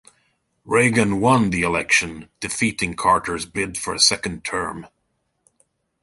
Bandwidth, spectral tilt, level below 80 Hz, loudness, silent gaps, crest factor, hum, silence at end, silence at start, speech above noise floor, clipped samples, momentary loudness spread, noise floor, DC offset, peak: 12 kHz; -3.5 dB/octave; -48 dBFS; -19 LUFS; none; 20 dB; none; 1.15 s; 0.65 s; 51 dB; under 0.1%; 11 LU; -72 dBFS; under 0.1%; -2 dBFS